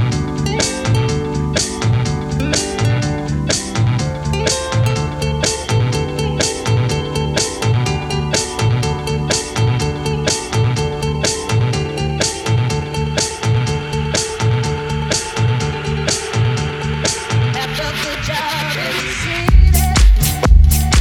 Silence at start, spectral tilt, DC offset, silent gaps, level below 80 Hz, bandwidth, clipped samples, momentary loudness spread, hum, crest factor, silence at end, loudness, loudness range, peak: 0 s; -4.5 dB/octave; under 0.1%; none; -22 dBFS; 17.5 kHz; under 0.1%; 7 LU; none; 16 dB; 0 s; -17 LUFS; 2 LU; 0 dBFS